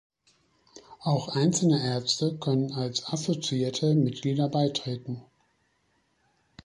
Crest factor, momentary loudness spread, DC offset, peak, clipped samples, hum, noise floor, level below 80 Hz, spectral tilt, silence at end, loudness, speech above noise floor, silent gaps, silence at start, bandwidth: 16 dB; 9 LU; under 0.1%; -12 dBFS; under 0.1%; none; -71 dBFS; -66 dBFS; -5.5 dB/octave; 1.4 s; -27 LUFS; 44 dB; none; 0.75 s; 11.5 kHz